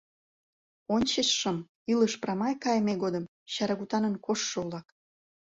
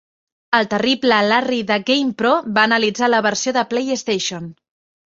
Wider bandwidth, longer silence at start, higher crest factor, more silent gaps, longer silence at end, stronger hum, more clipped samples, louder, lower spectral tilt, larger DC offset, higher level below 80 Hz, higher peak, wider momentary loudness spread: about the same, 8 kHz vs 7.8 kHz; first, 0.9 s vs 0.5 s; about the same, 18 dB vs 16 dB; first, 1.69-1.86 s, 3.28-3.46 s vs none; about the same, 0.6 s vs 0.6 s; neither; neither; second, -29 LUFS vs -17 LUFS; about the same, -4 dB/octave vs -3 dB/octave; neither; about the same, -66 dBFS vs -62 dBFS; second, -12 dBFS vs -2 dBFS; first, 10 LU vs 6 LU